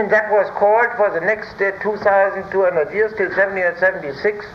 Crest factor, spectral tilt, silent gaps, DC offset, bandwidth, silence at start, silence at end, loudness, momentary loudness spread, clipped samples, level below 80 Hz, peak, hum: 14 dB; -6.5 dB/octave; none; under 0.1%; 6.6 kHz; 0 s; 0 s; -17 LUFS; 5 LU; under 0.1%; -54 dBFS; -4 dBFS; none